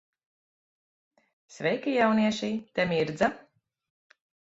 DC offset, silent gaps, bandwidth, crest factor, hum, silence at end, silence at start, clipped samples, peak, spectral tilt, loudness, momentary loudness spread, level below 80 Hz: under 0.1%; none; 8 kHz; 20 dB; none; 1.1 s; 1.5 s; under 0.1%; -10 dBFS; -5.5 dB/octave; -27 LUFS; 8 LU; -66 dBFS